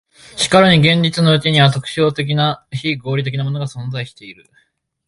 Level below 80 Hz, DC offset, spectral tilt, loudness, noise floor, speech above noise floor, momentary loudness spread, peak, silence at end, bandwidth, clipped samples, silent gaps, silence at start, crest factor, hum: -50 dBFS; under 0.1%; -5.5 dB/octave; -15 LUFS; -60 dBFS; 45 dB; 15 LU; 0 dBFS; 0.75 s; 11.5 kHz; under 0.1%; none; 0.35 s; 16 dB; none